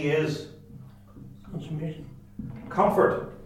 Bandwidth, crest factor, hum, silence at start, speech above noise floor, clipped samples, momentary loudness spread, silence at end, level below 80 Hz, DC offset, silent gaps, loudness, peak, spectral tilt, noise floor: 16 kHz; 22 dB; none; 0 s; 21 dB; under 0.1%; 25 LU; 0 s; -54 dBFS; under 0.1%; none; -26 LUFS; -6 dBFS; -7 dB/octave; -47 dBFS